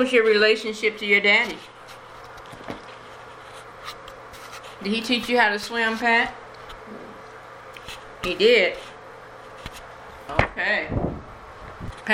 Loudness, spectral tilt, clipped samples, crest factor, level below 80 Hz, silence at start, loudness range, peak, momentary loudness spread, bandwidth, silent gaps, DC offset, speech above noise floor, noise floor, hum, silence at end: -21 LUFS; -4 dB/octave; under 0.1%; 24 dB; -46 dBFS; 0 s; 8 LU; -2 dBFS; 24 LU; 16 kHz; none; under 0.1%; 21 dB; -42 dBFS; none; 0 s